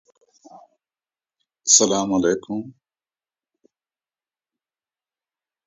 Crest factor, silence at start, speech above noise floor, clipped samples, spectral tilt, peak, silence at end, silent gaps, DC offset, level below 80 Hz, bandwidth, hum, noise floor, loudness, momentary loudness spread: 26 dB; 0.55 s; over 71 dB; under 0.1%; -2 dB/octave; 0 dBFS; 2.95 s; none; under 0.1%; -62 dBFS; 7.8 kHz; none; under -90 dBFS; -18 LUFS; 17 LU